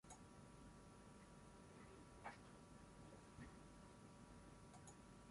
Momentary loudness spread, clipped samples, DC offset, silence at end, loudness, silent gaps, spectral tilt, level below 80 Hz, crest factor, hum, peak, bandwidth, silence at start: 5 LU; under 0.1%; under 0.1%; 0 s; -63 LUFS; none; -5 dB/octave; -72 dBFS; 22 dB; none; -42 dBFS; 11.5 kHz; 0.05 s